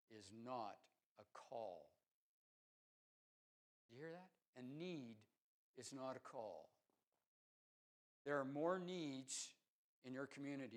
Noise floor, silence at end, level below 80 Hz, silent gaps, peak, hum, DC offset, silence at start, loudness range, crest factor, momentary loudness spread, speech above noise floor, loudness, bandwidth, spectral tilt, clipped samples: under -90 dBFS; 0 s; under -90 dBFS; 1.06-1.16 s, 2.08-3.89 s, 4.47-4.53 s, 5.40-5.74 s, 7.07-7.12 s, 7.26-8.25 s, 9.68-10.02 s; -30 dBFS; none; under 0.1%; 0.1 s; 11 LU; 24 dB; 19 LU; over 39 dB; -51 LUFS; 12 kHz; -4.5 dB/octave; under 0.1%